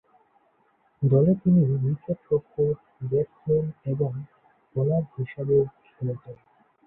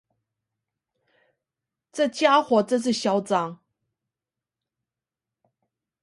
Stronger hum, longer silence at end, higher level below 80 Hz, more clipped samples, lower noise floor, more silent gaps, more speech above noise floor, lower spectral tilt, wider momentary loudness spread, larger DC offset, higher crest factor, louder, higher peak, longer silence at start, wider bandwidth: neither; second, 0.5 s vs 2.5 s; first, -58 dBFS vs -76 dBFS; neither; second, -66 dBFS vs -89 dBFS; neither; second, 42 dB vs 67 dB; first, -14.5 dB/octave vs -4.5 dB/octave; first, 13 LU vs 9 LU; neither; second, 16 dB vs 22 dB; second, -25 LUFS vs -22 LUFS; second, -10 dBFS vs -4 dBFS; second, 1 s vs 1.95 s; second, 2.9 kHz vs 11.5 kHz